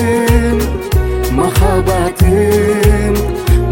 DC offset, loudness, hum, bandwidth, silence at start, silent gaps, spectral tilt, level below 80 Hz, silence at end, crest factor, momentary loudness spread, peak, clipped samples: under 0.1%; -13 LUFS; none; 17 kHz; 0 s; none; -6.5 dB/octave; -16 dBFS; 0 s; 12 dB; 4 LU; 0 dBFS; under 0.1%